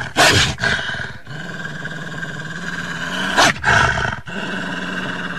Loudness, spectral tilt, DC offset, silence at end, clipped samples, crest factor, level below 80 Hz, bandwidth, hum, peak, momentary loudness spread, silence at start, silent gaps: -18 LUFS; -3 dB/octave; 2%; 0 s; under 0.1%; 18 dB; -38 dBFS; 16 kHz; none; -2 dBFS; 15 LU; 0 s; none